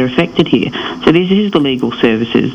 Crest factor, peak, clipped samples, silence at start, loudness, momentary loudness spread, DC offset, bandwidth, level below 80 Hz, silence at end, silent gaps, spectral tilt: 12 dB; 0 dBFS; under 0.1%; 0 s; -13 LUFS; 3 LU; under 0.1%; 8.8 kHz; -42 dBFS; 0 s; none; -7 dB/octave